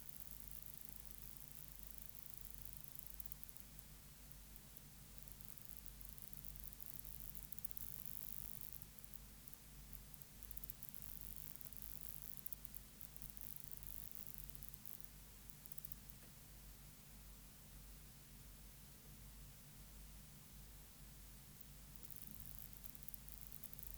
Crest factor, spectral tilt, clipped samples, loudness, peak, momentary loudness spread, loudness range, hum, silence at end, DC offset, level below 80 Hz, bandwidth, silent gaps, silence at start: 34 dB; -3 dB/octave; under 0.1%; -52 LUFS; -20 dBFS; 10 LU; 9 LU; none; 0 s; under 0.1%; -64 dBFS; over 20 kHz; none; 0 s